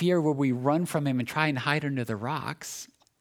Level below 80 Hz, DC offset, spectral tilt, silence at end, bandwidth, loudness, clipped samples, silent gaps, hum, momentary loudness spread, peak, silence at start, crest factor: -72 dBFS; under 0.1%; -6 dB/octave; 0.35 s; 18 kHz; -28 LUFS; under 0.1%; none; none; 12 LU; -8 dBFS; 0 s; 20 dB